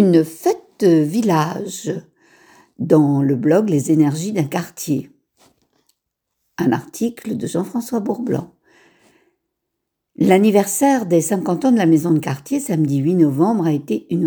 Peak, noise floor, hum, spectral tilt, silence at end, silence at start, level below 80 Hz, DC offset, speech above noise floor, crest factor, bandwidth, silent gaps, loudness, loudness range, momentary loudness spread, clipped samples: 0 dBFS; -78 dBFS; none; -6.5 dB/octave; 0 s; 0 s; -64 dBFS; under 0.1%; 61 dB; 18 dB; over 20 kHz; none; -18 LUFS; 8 LU; 10 LU; under 0.1%